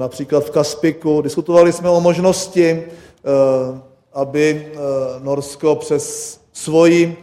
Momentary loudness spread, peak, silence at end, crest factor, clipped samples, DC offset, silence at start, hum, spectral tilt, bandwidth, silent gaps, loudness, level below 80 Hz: 14 LU; 0 dBFS; 0.05 s; 16 dB; under 0.1%; under 0.1%; 0 s; none; -5.5 dB/octave; 15 kHz; none; -16 LUFS; -56 dBFS